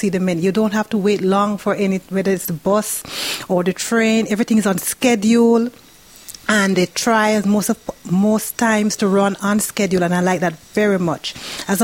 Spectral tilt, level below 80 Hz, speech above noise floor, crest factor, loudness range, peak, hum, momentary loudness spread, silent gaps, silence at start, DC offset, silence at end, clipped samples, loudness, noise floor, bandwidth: -4.5 dB/octave; -54 dBFS; 23 dB; 16 dB; 2 LU; 0 dBFS; none; 7 LU; none; 0 s; 0.1%; 0 s; under 0.1%; -17 LUFS; -40 dBFS; 17 kHz